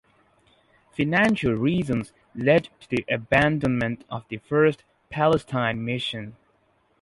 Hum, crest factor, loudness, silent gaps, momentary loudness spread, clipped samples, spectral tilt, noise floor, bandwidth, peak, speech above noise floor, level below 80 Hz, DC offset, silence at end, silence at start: none; 20 dB; -24 LUFS; none; 14 LU; under 0.1%; -7 dB/octave; -65 dBFS; 11.5 kHz; -4 dBFS; 42 dB; -52 dBFS; under 0.1%; 0.7 s; 1 s